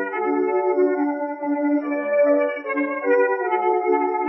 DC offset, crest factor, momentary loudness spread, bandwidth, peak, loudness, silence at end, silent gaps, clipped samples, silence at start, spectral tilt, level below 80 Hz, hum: under 0.1%; 12 dB; 5 LU; 5.6 kHz; -8 dBFS; -21 LUFS; 0 s; none; under 0.1%; 0 s; -9.5 dB/octave; -90 dBFS; none